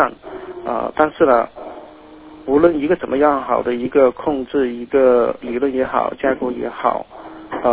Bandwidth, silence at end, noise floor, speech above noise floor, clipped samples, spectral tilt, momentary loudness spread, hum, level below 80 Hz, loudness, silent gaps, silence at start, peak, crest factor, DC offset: 4 kHz; 0 s; -40 dBFS; 23 dB; under 0.1%; -10 dB/octave; 18 LU; none; -48 dBFS; -18 LUFS; none; 0 s; 0 dBFS; 18 dB; under 0.1%